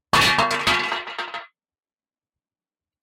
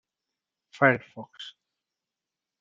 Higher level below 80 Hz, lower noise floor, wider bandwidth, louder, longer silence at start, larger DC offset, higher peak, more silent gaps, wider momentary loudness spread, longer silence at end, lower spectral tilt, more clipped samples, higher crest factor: first, -50 dBFS vs -76 dBFS; about the same, under -90 dBFS vs -88 dBFS; first, 16.5 kHz vs 7.6 kHz; first, -20 LUFS vs -24 LUFS; second, 0.15 s vs 0.8 s; neither; about the same, -6 dBFS vs -4 dBFS; neither; second, 15 LU vs 21 LU; first, 1.55 s vs 1.1 s; second, -2 dB/octave vs -7 dB/octave; neither; second, 18 dB vs 26 dB